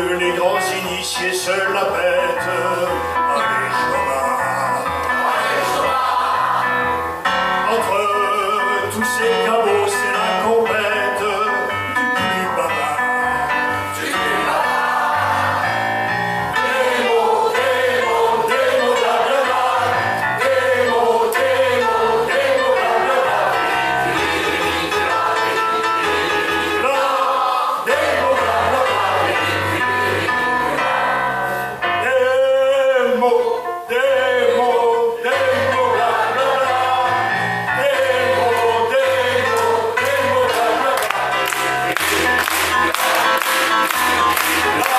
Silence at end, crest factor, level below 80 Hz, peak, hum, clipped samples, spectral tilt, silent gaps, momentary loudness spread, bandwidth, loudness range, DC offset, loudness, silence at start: 0 s; 16 dB; -50 dBFS; 0 dBFS; none; under 0.1%; -3 dB/octave; none; 3 LU; 15.5 kHz; 2 LU; under 0.1%; -17 LUFS; 0 s